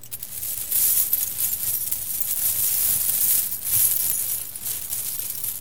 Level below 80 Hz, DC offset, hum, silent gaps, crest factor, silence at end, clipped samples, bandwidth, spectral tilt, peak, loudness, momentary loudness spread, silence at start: -56 dBFS; 0.8%; none; none; 22 dB; 0 s; under 0.1%; 19 kHz; 0.5 dB/octave; -2 dBFS; -20 LUFS; 9 LU; 0.05 s